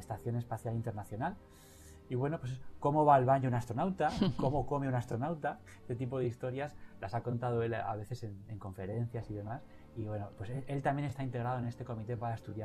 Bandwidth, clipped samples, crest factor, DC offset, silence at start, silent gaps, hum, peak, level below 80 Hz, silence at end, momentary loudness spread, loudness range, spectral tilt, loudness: 13.5 kHz; under 0.1%; 22 dB; under 0.1%; 0 s; none; none; -14 dBFS; -58 dBFS; 0 s; 13 LU; 8 LU; -8 dB/octave; -36 LUFS